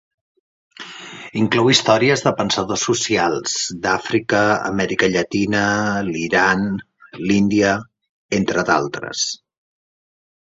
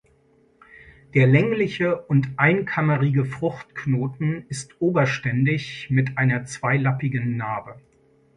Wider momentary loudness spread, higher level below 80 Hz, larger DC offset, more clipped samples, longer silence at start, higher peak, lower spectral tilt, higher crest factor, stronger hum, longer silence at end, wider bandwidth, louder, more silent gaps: first, 12 LU vs 9 LU; first, -52 dBFS vs -58 dBFS; neither; neither; about the same, 0.8 s vs 0.75 s; first, 0 dBFS vs -4 dBFS; second, -4 dB/octave vs -7 dB/octave; about the same, 20 dB vs 20 dB; neither; first, 1.1 s vs 0.6 s; second, 8 kHz vs 10.5 kHz; first, -18 LUFS vs -22 LUFS; first, 8.09-8.29 s vs none